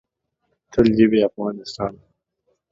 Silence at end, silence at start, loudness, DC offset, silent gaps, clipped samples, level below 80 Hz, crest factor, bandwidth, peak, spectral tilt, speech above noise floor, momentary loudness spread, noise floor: 0.75 s; 0.75 s; -20 LUFS; under 0.1%; none; under 0.1%; -48 dBFS; 20 dB; 7.6 kHz; -2 dBFS; -7 dB/octave; 54 dB; 13 LU; -73 dBFS